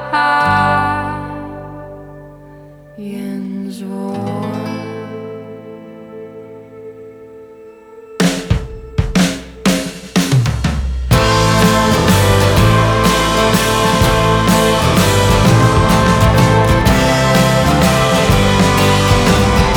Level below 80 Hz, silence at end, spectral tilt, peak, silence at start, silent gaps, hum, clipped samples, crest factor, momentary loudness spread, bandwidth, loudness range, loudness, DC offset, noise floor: -24 dBFS; 0 s; -5 dB/octave; 0 dBFS; 0 s; none; none; under 0.1%; 14 dB; 21 LU; over 20 kHz; 15 LU; -13 LUFS; under 0.1%; -38 dBFS